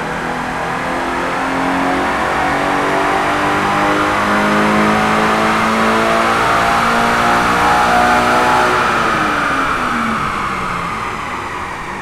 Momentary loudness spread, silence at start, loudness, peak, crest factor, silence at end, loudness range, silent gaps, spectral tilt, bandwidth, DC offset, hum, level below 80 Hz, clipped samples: 8 LU; 0 s; -14 LUFS; -2 dBFS; 12 dB; 0 s; 4 LU; none; -4 dB/octave; 16.5 kHz; under 0.1%; none; -36 dBFS; under 0.1%